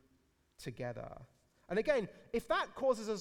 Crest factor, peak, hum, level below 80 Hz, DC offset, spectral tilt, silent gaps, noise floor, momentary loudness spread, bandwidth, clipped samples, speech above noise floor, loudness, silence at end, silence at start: 20 dB; -20 dBFS; none; -62 dBFS; under 0.1%; -5 dB/octave; none; -74 dBFS; 16 LU; 16 kHz; under 0.1%; 37 dB; -37 LUFS; 0 s; 0.6 s